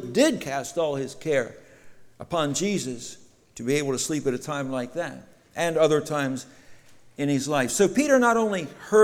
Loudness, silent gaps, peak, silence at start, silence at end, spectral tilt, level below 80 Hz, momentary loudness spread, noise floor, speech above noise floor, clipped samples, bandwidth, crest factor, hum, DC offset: -25 LUFS; none; -6 dBFS; 0 s; 0 s; -4.5 dB/octave; -60 dBFS; 14 LU; -48 dBFS; 24 dB; under 0.1%; 17 kHz; 20 dB; none; under 0.1%